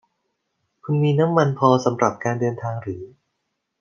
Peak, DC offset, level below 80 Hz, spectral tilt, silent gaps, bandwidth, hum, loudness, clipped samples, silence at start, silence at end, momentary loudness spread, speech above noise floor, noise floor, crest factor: -2 dBFS; under 0.1%; -68 dBFS; -7 dB/octave; none; 7.2 kHz; none; -20 LUFS; under 0.1%; 0.85 s; 0.75 s; 14 LU; 57 dB; -76 dBFS; 20 dB